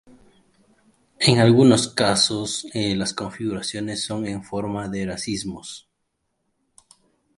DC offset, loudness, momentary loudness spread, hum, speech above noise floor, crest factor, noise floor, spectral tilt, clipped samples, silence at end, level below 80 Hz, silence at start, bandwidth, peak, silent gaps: under 0.1%; -21 LUFS; 14 LU; none; 53 dB; 22 dB; -74 dBFS; -4.5 dB/octave; under 0.1%; 1.6 s; -54 dBFS; 1.2 s; 11.5 kHz; 0 dBFS; none